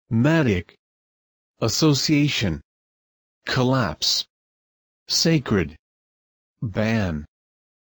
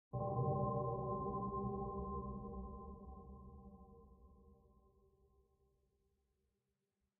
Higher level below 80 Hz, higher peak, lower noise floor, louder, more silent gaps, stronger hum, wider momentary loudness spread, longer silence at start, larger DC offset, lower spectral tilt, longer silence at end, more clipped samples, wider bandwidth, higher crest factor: first, -48 dBFS vs -58 dBFS; first, -8 dBFS vs -28 dBFS; about the same, under -90 dBFS vs -88 dBFS; first, -21 LUFS vs -43 LUFS; first, 0.79-1.54 s, 2.64-3.41 s, 4.30-5.06 s, 5.79-6.56 s vs none; neither; second, 13 LU vs 21 LU; about the same, 0.1 s vs 0.1 s; neither; first, -4.5 dB/octave vs -3 dB/octave; second, 0.65 s vs 2.65 s; neither; first, over 20 kHz vs 1.4 kHz; about the same, 16 dB vs 18 dB